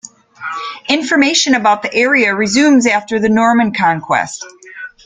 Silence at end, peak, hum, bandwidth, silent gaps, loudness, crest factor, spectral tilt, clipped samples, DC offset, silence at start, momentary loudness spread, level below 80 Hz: 0.2 s; 0 dBFS; none; 9.6 kHz; none; -12 LUFS; 14 dB; -3 dB/octave; under 0.1%; under 0.1%; 0.4 s; 16 LU; -52 dBFS